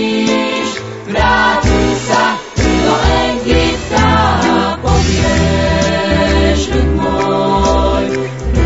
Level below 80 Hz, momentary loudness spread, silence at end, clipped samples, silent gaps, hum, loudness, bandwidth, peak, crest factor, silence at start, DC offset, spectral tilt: -20 dBFS; 5 LU; 0 s; under 0.1%; none; none; -13 LUFS; 8 kHz; 0 dBFS; 12 dB; 0 s; 0.7%; -5 dB/octave